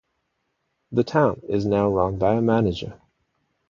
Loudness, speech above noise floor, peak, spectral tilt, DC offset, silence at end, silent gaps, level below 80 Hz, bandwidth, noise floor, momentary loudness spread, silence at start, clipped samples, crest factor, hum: -22 LUFS; 53 dB; -4 dBFS; -8 dB/octave; under 0.1%; 0.75 s; none; -46 dBFS; 7.4 kHz; -74 dBFS; 7 LU; 0.9 s; under 0.1%; 20 dB; none